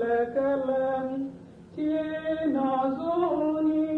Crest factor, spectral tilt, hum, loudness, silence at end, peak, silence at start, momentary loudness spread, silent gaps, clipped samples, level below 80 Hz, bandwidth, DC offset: 12 dB; -8 dB/octave; none; -27 LUFS; 0 s; -16 dBFS; 0 s; 8 LU; none; under 0.1%; -60 dBFS; 4.3 kHz; under 0.1%